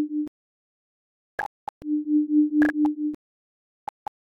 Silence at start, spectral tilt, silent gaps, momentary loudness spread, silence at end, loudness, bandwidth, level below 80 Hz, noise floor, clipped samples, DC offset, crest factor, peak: 0 s; -6.5 dB/octave; 0.28-1.38 s, 1.46-1.81 s; 21 LU; 1.15 s; -25 LUFS; 4.2 kHz; -64 dBFS; under -90 dBFS; under 0.1%; under 0.1%; 16 dB; -10 dBFS